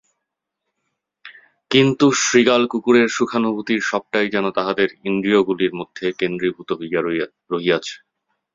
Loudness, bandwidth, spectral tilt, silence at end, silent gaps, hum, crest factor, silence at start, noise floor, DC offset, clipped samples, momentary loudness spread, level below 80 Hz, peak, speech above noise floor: -19 LUFS; 7.8 kHz; -4 dB/octave; 0.6 s; none; none; 18 dB; 1.25 s; -80 dBFS; under 0.1%; under 0.1%; 10 LU; -60 dBFS; 0 dBFS; 61 dB